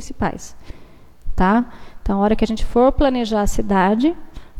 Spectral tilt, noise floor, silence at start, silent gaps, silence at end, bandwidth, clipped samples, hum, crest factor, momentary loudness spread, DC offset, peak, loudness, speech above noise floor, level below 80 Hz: -6 dB/octave; -39 dBFS; 0 s; none; 0 s; 13.5 kHz; under 0.1%; none; 16 dB; 16 LU; under 0.1%; -2 dBFS; -18 LUFS; 22 dB; -28 dBFS